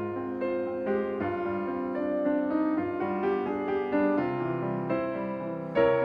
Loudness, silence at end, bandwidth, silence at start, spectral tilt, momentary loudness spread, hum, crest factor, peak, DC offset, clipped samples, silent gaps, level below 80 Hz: -29 LUFS; 0 s; 5.4 kHz; 0 s; -9.5 dB/octave; 5 LU; none; 16 dB; -12 dBFS; under 0.1%; under 0.1%; none; -62 dBFS